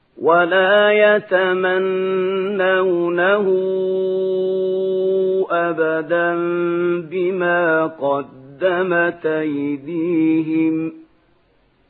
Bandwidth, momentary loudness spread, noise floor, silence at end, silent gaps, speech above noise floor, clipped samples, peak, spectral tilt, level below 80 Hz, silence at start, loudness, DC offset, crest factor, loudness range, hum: 4.2 kHz; 8 LU; -58 dBFS; 0.9 s; none; 41 dB; under 0.1%; -2 dBFS; -9 dB/octave; -70 dBFS; 0.15 s; -18 LUFS; under 0.1%; 16 dB; 4 LU; none